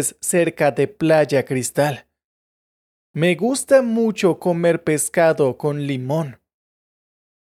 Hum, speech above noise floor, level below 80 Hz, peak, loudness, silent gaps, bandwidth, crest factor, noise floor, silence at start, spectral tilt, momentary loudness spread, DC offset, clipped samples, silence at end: none; over 72 dB; -64 dBFS; -4 dBFS; -19 LUFS; 2.24-3.14 s; 15 kHz; 16 dB; under -90 dBFS; 0 s; -5 dB/octave; 8 LU; under 0.1%; under 0.1%; 1.2 s